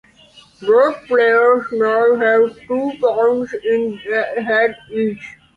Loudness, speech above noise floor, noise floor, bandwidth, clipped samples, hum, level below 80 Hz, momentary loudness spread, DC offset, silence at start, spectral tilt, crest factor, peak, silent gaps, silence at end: -16 LUFS; 31 dB; -47 dBFS; 6.6 kHz; under 0.1%; none; -60 dBFS; 8 LU; under 0.1%; 0.6 s; -6 dB/octave; 14 dB; -2 dBFS; none; 0.25 s